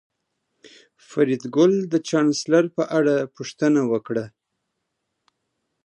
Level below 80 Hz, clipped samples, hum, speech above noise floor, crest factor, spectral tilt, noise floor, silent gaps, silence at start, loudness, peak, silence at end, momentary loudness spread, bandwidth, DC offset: -72 dBFS; under 0.1%; none; 57 dB; 18 dB; -5.5 dB/octave; -78 dBFS; none; 1.1 s; -21 LUFS; -6 dBFS; 1.55 s; 10 LU; 10.5 kHz; under 0.1%